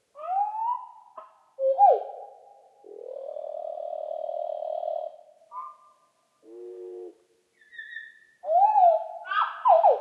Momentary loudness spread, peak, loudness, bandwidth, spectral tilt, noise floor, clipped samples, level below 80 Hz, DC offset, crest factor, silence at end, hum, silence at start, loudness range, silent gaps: 25 LU; -8 dBFS; -25 LUFS; 5 kHz; -2.5 dB/octave; -67 dBFS; under 0.1%; under -90 dBFS; under 0.1%; 18 dB; 0 s; none; 0.15 s; 14 LU; none